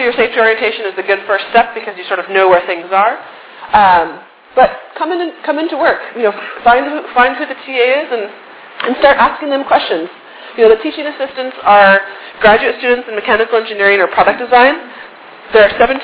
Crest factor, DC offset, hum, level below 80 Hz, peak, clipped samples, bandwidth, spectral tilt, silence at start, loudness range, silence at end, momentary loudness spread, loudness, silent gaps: 12 dB; under 0.1%; none; -46 dBFS; 0 dBFS; 0.5%; 4 kHz; -7 dB/octave; 0 s; 3 LU; 0 s; 12 LU; -12 LUFS; none